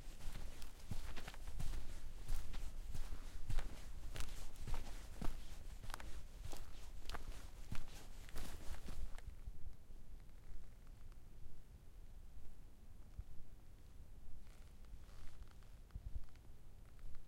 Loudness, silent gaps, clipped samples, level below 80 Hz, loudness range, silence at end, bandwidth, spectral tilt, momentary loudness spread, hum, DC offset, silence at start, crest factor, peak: -55 LUFS; none; under 0.1%; -48 dBFS; 10 LU; 0 s; 13.5 kHz; -4.5 dB/octave; 12 LU; none; under 0.1%; 0 s; 18 dB; -24 dBFS